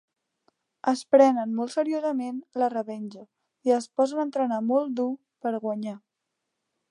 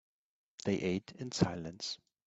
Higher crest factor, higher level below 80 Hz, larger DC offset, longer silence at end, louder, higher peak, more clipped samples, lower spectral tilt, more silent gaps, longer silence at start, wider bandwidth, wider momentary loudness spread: about the same, 20 dB vs 24 dB; second, -84 dBFS vs -66 dBFS; neither; first, 0.95 s vs 0.3 s; first, -26 LUFS vs -37 LUFS; first, -6 dBFS vs -14 dBFS; neither; about the same, -5.5 dB/octave vs -5 dB/octave; neither; first, 0.85 s vs 0.65 s; first, 11 kHz vs 8.2 kHz; first, 13 LU vs 8 LU